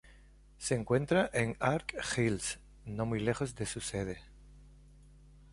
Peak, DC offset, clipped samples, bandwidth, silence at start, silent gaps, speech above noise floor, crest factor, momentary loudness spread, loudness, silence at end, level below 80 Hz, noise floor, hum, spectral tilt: -14 dBFS; under 0.1%; under 0.1%; 11.5 kHz; 0.05 s; none; 25 dB; 22 dB; 11 LU; -34 LUFS; 0.1 s; -54 dBFS; -58 dBFS; none; -5 dB/octave